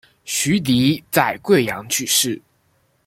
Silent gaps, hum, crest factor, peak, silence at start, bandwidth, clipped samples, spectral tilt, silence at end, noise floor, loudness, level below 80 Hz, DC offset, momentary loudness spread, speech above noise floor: none; none; 18 dB; -2 dBFS; 0.25 s; 16.5 kHz; under 0.1%; -3.5 dB/octave; 0.7 s; -63 dBFS; -18 LUFS; -54 dBFS; under 0.1%; 6 LU; 44 dB